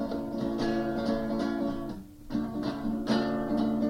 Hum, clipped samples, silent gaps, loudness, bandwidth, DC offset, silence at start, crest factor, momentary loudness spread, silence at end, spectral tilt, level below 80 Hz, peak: none; under 0.1%; none; -31 LUFS; 16 kHz; under 0.1%; 0 s; 16 dB; 7 LU; 0 s; -7 dB/octave; -48 dBFS; -14 dBFS